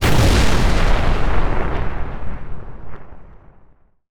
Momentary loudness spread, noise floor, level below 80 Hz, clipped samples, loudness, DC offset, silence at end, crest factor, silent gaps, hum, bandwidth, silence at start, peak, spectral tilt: 23 LU; -50 dBFS; -20 dBFS; under 0.1%; -19 LUFS; under 0.1%; 0.85 s; 12 dB; none; none; 18 kHz; 0 s; -4 dBFS; -5 dB/octave